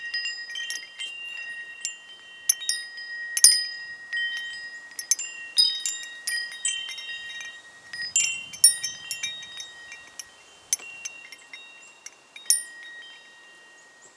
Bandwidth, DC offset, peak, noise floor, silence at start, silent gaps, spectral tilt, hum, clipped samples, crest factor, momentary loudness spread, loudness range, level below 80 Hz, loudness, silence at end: 11 kHz; under 0.1%; 0 dBFS; -52 dBFS; 0 s; none; 4.5 dB/octave; none; under 0.1%; 28 dB; 25 LU; 9 LU; -78 dBFS; -24 LUFS; 0.1 s